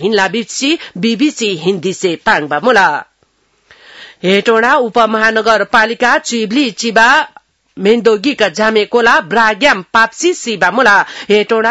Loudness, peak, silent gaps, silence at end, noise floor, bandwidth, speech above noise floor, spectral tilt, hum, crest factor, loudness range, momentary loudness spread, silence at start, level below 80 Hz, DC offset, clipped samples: -11 LUFS; 0 dBFS; none; 0 s; -57 dBFS; 12 kHz; 46 dB; -3.5 dB/octave; none; 12 dB; 3 LU; 6 LU; 0 s; -52 dBFS; 0.2%; 0.4%